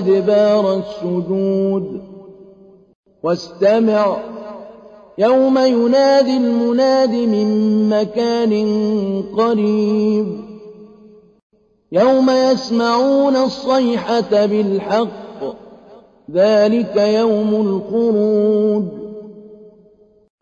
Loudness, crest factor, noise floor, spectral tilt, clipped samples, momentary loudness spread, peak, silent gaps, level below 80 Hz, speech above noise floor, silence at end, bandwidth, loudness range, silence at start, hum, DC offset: -15 LUFS; 12 dB; -50 dBFS; -6.5 dB/octave; under 0.1%; 13 LU; -4 dBFS; 2.95-3.03 s, 11.43-11.50 s; -58 dBFS; 36 dB; 0.8 s; 7.4 kHz; 5 LU; 0 s; none; under 0.1%